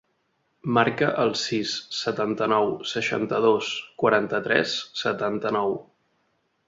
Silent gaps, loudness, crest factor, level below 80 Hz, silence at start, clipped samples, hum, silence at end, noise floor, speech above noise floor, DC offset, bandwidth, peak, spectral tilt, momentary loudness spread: none; -24 LUFS; 22 dB; -66 dBFS; 0.65 s; under 0.1%; none; 0.85 s; -71 dBFS; 47 dB; under 0.1%; 7.8 kHz; -4 dBFS; -4.5 dB/octave; 6 LU